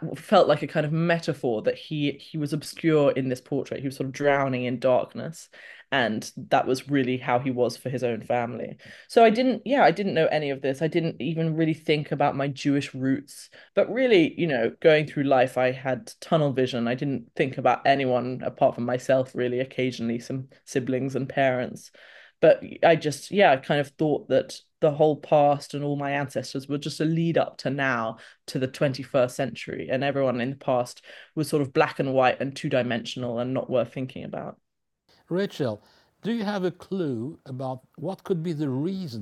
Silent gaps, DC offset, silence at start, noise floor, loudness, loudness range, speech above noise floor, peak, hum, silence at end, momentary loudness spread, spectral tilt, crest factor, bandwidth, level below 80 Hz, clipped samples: none; under 0.1%; 0 s; -69 dBFS; -25 LUFS; 6 LU; 44 dB; -6 dBFS; none; 0 s; 13 LU; -6 dB/octave; 20 dB; 12.5 kHz; -70 dBFS; under 0.1%